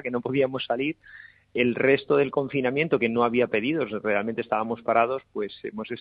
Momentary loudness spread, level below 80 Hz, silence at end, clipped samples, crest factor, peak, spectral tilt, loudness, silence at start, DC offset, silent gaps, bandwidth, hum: 11 LU; -64 dBFS; 0 s; under 0.1%; 18 dB; -8 dBFS; -9 dB/octave; -25 LUFS; 0.05 s; under 0.1%; none; 5 kHz; none